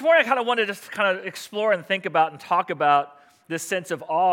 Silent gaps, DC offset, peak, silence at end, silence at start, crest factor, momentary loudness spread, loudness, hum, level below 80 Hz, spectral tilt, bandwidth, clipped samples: none; under 0.1%; -4 dBFS; 0 s; 0 s; 18 dB; 10 LU; -23 LUFS; none; -80 dBFS; -3.5 dB/octave; 17 kHz; under 0.1%